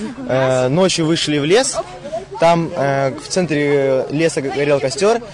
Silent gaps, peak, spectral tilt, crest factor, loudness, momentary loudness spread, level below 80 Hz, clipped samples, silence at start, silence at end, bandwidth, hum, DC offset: none; -4 dBFS; -4.5 dB/octave; 12 dB; -16 LUFS; 6 LU; -50 dBFS; under 0.1%; 0 s; 0 s; 11 kHz; none; under 0.1%